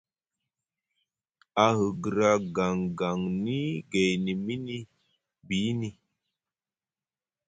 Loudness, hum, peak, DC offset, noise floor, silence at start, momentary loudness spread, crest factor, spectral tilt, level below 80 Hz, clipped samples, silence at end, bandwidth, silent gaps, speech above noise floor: -28 LUFS; none; -8 dBFS; under 0.1%; under -90 dBFS; 1.55 s; 10 LU; 22 dB; -6 dB/octave; -62 dBFS; under 0.1%; 1.55 s; 9.2 kHz; none; over 63 dB